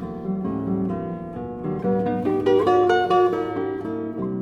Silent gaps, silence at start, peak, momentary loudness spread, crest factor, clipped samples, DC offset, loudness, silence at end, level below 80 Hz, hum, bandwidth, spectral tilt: none; 0 s; -8 dBFS; 11 LU; 16 dB; under 0.1%; under 0.1%; -23 LUFS; 0 s; -50 dBFS; none; 7 kHz; -8 dB/octave